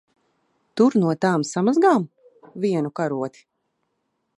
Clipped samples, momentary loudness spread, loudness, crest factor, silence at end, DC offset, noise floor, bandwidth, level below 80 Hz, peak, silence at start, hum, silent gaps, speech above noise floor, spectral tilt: under 0.1%; 15 LU; -21 LUFS; 18 dB; 1.1 s; under 0.1%; -74 dBFS; 11 kHz; -74 dBFS; -4 dBFS; 0.75 s; none; none; 54 dB; -6.5 dB/octave